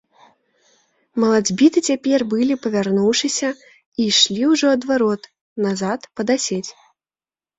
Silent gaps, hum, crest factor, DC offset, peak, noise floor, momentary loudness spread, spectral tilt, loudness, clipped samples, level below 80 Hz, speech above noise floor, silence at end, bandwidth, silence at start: 3.86-3.92 s, 5.41-5.56 s; none; 18 dB; under 0.1%; 0 dBFS; under -90 dBFS; 13 LU; -3.5 dB/octave; -18 LUFS; under 0.1%; -62 dBFS; over 72 dB; 0.9 s; 8.2 kHz; 1.15 s